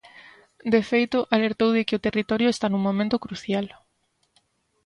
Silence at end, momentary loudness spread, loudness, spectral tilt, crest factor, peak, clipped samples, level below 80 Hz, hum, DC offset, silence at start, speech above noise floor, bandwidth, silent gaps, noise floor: 1.2 s; 7 LU; -23 LUFS; -6 dB/octave; 22 dB; -2 dBFS; under 0.1%; -60 dBFS; none; under 0.1%; 0.65 s; 48 dB; 11 kHz; none; -70 dBFS